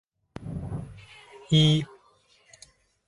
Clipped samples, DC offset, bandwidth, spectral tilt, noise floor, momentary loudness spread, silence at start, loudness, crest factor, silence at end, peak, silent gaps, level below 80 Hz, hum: under 0.1%; under 0.1%; 11.5 kHz; -6 dB/octave; -62 dBFS; 27 LU; 0.4 s; -25 LUFS; 20 dB; 1.25 s; -10 dBFS; none; -52 dBFS; none